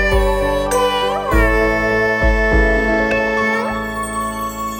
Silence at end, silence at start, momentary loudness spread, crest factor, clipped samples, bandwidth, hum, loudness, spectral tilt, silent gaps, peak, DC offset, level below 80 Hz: 0 s; 0 s; 7 LU; 14 dB; under 0.1%; 18.5 kHz; none; -16 LUFS; -5 dB/octave; none; -2 dBFS; under 0.1%; -22 dBFS